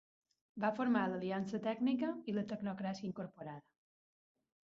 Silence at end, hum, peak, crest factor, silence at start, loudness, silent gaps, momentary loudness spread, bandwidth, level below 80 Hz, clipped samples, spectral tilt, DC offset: 1.1 s; none; -20 dBFS; 20 dB; 0.55 s; -39 LUFS; none; 15 LU; 7.4 kHz; -80 dBFS; under 0.1%; -5.5 dB/octave; under 0.1%